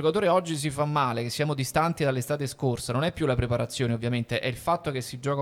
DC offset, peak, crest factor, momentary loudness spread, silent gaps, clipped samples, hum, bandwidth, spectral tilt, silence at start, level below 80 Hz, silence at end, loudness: under 0.1%; -8 dBFS; 18 dB; 5 LU; none; under 0.1%; none; 16.5 kHz; -5.5 dB/octave; 0 s; -50 dBFS; 0 s; -27 LUFS